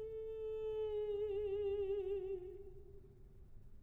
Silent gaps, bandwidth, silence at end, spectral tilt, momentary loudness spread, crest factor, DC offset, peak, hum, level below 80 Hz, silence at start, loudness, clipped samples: none; 4 kHz; 0 s; -8 dB/octave; 18 LU; 10 dB; under 0.1%; -32 dBFS; none; -58 dBFS; 0 s; -42 LUFS; under 0.1%